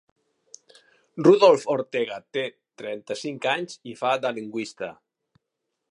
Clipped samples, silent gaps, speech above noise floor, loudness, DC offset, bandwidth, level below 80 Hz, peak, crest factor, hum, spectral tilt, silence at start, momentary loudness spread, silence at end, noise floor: under 0.1%; none; 58 dB; -23 LUFS; under 0.1%; 11 kHz; -76 dBFS; -4 dBFS; 22 dB; none; -5 dB/octave; 1.15 s; 19 LU; 1 s; -81 dBFS